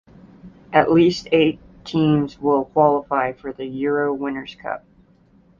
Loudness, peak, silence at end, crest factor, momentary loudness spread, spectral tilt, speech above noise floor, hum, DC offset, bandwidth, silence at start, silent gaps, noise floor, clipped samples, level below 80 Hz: -20 LUFS; -2 dBFS; 0.8 s; 18 dB; 14 LU; -7 dB/octave; 35 dB; none; under 0.1%; 7.2 kHz; 0.45 s; none; -54 dBFS; under 0.1%; -52 dBFS